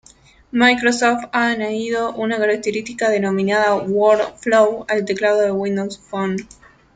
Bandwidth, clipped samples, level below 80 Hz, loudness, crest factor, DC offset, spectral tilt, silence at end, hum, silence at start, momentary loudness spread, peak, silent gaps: 9.4 kHz; under 0.1%; -56 dBFS; -18 LUFS; 16 dB; under 0.1%; -4.5 dB/octave; 0.5 s; none; 0.55 s; 8 LU; -2 dBFS; none